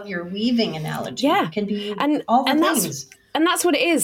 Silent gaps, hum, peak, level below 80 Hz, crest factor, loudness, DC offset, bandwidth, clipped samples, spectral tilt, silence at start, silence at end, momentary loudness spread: none; none; -6 dBFS; -62 dBFS; 14 dB; -21 LUFS; under 0.1%; 17 kHz; under 0.1%; -3.5 dB/octave; 0 s; 0 s; 10 LU